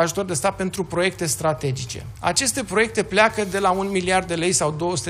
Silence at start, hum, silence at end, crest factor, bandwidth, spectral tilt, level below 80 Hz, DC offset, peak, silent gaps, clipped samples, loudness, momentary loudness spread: 0 s; none; 0 s; 18 dB; 16 kHz; -3.5 dB/octave; -46 dBFS; under 0.1%; -4 dBFS; none; under 0.1%; -21 LUFS; 8 LU